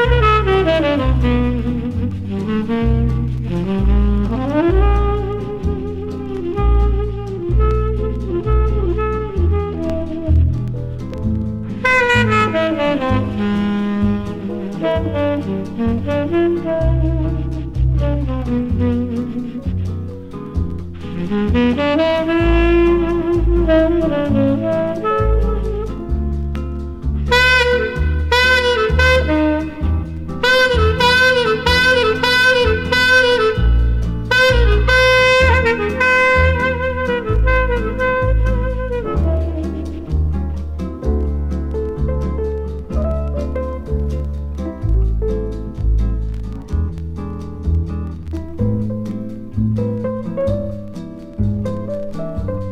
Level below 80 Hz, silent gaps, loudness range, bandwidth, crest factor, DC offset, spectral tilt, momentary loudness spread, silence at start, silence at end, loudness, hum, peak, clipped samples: -22 dBFS; none; 9 LU; 13 kHz; 16 dB; under 0.1%; -6.5 dB/octave; 12 LU; 0 s; 0 s; -17 LUFS; none; 0 dBFS; under 0.1%